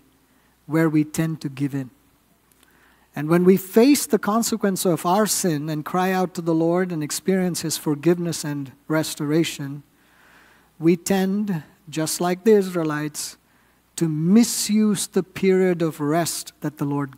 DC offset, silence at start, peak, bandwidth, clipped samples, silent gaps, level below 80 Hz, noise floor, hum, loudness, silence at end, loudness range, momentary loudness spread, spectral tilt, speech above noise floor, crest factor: under 0.1%; 0.7 s; -2 dBFS; 16 kHz; under 0.1%; none; -64 dBFS; -60 dBFS; none; -21 LUFS; 0.05 s; 5 LU; 12 LU; -5 dB/octave; 39 dB; 20 dB